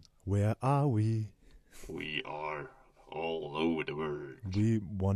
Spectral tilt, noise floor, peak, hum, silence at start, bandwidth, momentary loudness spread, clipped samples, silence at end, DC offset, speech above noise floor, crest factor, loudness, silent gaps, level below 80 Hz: -7.5 dB/octave; -53 dBFS; -18 dBFS; none; 0.25 s; 11.5 kHz; 14 LU; under 0.1%; 0 s; under 0.1%; 20 dB; 16 dB; -34 LUFS; none; -58 dBFS